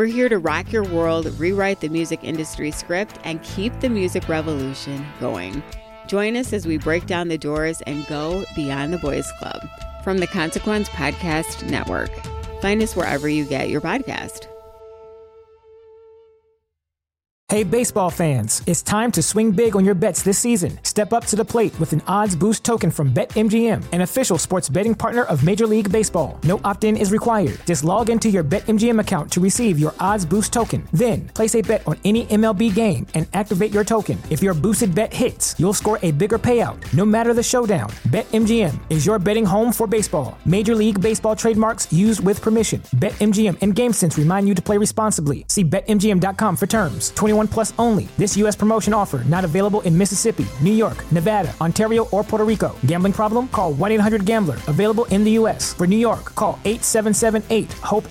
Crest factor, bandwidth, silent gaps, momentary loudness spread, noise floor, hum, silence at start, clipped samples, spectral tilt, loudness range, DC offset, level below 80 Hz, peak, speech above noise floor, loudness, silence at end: 12 dB; 16.5 kHz; 17.31-17.47 s; 7 LU; -84 dBFS; none; 0 s; under 0.1%; -5 dB/octave; 6 LU; under 0.1%; -40 dBFS; -6 dBFS; 66 dB; -19 LUFS; 0 s